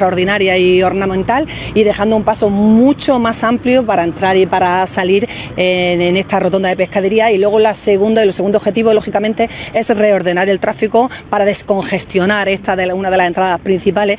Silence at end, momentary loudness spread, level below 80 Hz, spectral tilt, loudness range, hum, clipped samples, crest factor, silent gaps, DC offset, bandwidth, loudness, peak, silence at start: 0 s; 5 LU; -40 dBFS; -10 dB/octave; 2 LU; none; under 0.1%; 12 dB; none; under 0.1%; 4 kHz; -13 LUFS; 0 dBFS; 0 s